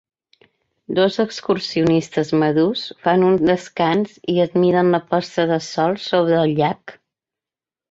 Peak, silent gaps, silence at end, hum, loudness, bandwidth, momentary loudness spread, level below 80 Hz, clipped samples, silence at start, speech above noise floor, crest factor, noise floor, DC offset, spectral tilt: -2 dBFS; none; 1 s; none; -18 LUFS; 7.8 kHz; 6 LU; -58 dBFS; under 0.1%; 0.9 s; 72 dB; 16 dB; -90 dBFS; under 0.1%; -6.5 dB/octave